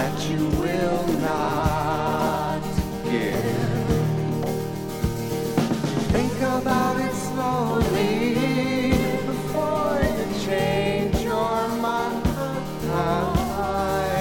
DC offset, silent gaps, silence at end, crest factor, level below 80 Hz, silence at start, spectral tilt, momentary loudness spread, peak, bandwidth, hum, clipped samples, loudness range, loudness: under 0.1%; none; 0 s; 16 dB; -36 dBFS; 0 s; -6 dB/octave; 4 LU; -6 dBFS; 17.5 kHz; none; under 0.1%; 2 LU; -24 LUFS